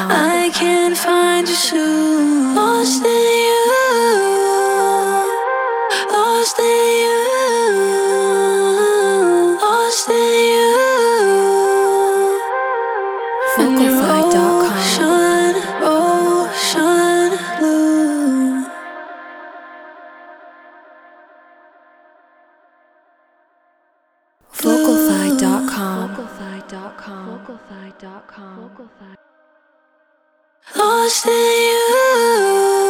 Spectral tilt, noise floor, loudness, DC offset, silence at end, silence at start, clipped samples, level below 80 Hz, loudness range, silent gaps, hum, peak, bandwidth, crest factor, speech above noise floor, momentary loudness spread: -3 dB/octave; -62 dBFS; -14 LUFS; under 0.1%; 0 s; 0 s; under 0.1%; -62 dBFS; 10 LU; none; none; -2 dBFS; 19 kHz; 14 dB; 48 dB; 15 LU